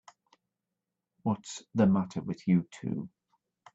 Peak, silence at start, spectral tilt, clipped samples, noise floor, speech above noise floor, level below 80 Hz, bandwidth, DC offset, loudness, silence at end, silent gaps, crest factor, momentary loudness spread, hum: -12 dBFS; 1.25 s; -7.5 dB/octave; under 0.1%; -87 dBFS; 58 dB; -70 dBFS; 8 kHz; under 0.1%; -31 LUFS; 0.65 s; none; 20 dB; 11 LU; none